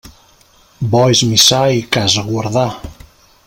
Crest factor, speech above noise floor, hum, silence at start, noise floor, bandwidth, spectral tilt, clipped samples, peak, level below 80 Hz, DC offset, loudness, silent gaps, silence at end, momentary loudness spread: 16 dB; 36 dB; none; 0.05 s; -49 dBFS; 17 kHz; -3.5 dB/octave; under 0.1%; 0 dBFS; -44 dBFS; under 0.1%; -12 LUFS; none; 0.55 s; 11 LU